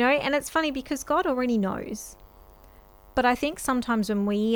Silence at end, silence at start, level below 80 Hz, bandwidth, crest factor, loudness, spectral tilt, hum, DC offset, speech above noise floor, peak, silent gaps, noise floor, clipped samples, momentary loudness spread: 0 s; 0 s; -50 dBFS; over 20 kHz; 18 dB; -26 LUFS; -4.5 dB/octave; none; under 0.1%; 27 dB; -8 dBFS; none; -52 dBFS; under 0.1%; 9 LU